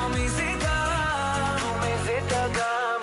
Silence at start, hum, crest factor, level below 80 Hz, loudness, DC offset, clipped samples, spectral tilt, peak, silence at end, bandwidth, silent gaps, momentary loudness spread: 0 s; none; 12 dB; -36 dBFS; -26 LUFS; under 0.1%; under 0.1%; -4 dB/octave; -14 dBFS; 0 s; 11.5 kHz; none; 2 LU